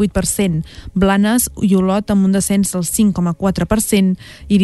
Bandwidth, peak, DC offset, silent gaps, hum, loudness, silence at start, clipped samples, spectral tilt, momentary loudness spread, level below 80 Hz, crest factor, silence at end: 12.5 kHz; -2 dBFS; under 0.1%; none; none; -16 LUFS; 0 s; under 0.1%; -5.5 dB/octave; 5 LU; -34 dBFS; 12 dB; 0 s